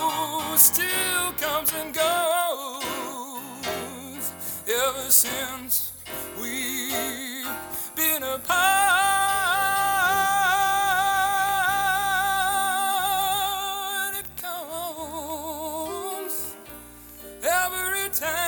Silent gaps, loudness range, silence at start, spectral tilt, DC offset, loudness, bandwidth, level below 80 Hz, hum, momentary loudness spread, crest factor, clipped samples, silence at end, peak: none; 8 LU; 0 s; -0.5 dB/octave; under 0.1%; -23 LUFS; over 20 kHz; -56 dBFS; none; 13 LU; 22 dB; under 0.1%; 0 s; -2 dBFS